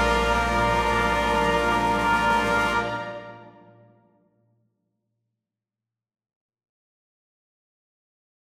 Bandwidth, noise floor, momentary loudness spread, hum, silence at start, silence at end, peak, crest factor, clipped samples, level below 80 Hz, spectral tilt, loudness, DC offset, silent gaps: 16 kHz; -89 dBFS; 11 LU; none; 0 s; 5.1 s; -8 dBFS; 18 dB; under 0.1%; -40 dBFS; -4.5 dB/octave; -22 LUFS; under 0.1%; none